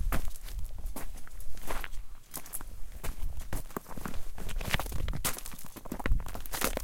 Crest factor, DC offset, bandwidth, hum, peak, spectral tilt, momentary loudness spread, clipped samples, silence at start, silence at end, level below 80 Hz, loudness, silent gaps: 22 dB; under 0.1%; 17 kHz; none; -8 dBFS; -3.5 dB/octave; 12 LU; under 0.1%; 0 s; 0 s; -36 dBFS; -39 LUFS; none